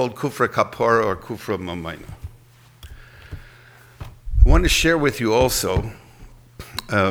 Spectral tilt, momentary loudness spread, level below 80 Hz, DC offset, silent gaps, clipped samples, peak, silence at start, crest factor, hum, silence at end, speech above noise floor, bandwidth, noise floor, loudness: -4.5 dB/octave; 24 LU; -26 dBFS; under 0.1%; none; under 0.1%; 0 dBFS; 0 s; 20 dB; none; 0 s; 29 dB; 18 kHz; -49 dBFS; -20 LUFS